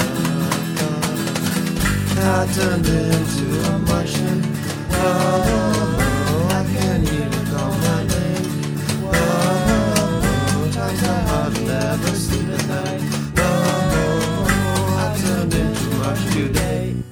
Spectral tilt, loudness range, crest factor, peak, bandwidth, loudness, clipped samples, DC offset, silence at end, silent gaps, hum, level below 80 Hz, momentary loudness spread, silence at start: -5.5 dB/octave; 1 LU; 16 dB; -2 dBFS; 20 kHz; -19 LUFS; under 0.1%; under 0.1%; 0 s; none; none; -32 dBFS; 4 LU; 0 s